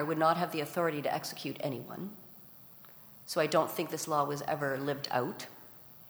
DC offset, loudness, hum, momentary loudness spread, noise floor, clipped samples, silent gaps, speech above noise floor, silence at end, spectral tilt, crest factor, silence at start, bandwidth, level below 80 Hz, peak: under 0.1%; -33 LUFS; none; 22 LU; -54 dBFS; under 0.1%; none; 21 dB; 0 s; -4.5 dB/octave; 20 dB; 0 s; over 20 kHz; -78 dBFS; -14 dBFS